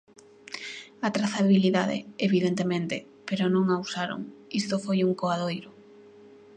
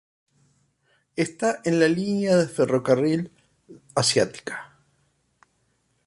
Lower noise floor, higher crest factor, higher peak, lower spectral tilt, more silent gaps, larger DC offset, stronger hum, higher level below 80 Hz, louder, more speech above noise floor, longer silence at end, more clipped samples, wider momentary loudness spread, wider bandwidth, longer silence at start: second, -51 dBFS vs -69 dBFS; about the same, 18 dB vs 20 dB; second, -10 dBFS vs -4 dBFS; first, -6 dB/octave vs -4.5 dB/octave; neither; neither; neither; second, -72 dBFS vs -64 dBFS; second, -27 LUFS vs -23 LUFS; second, 26 dB vs 47 dB; second, 0.55 s vs 1.4 s; neither; about the same, 15 LU vs 14 LU; second, 9.2 kHz vs 11.5 kHz; second, 0.5 s vs 1.15 s